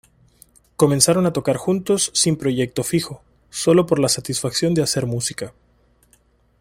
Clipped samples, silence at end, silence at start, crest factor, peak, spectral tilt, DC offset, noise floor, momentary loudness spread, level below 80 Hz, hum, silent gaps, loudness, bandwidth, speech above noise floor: under 0.1%; 1.1 s; 0.8 s; 20 dB; 0 dBFS; -4.5 dB/octave; under 0.1%; -58 dBFS; 11 LU; -52 dBFS; none; none; -19 LUFS; 16.5 kHz; 39 dB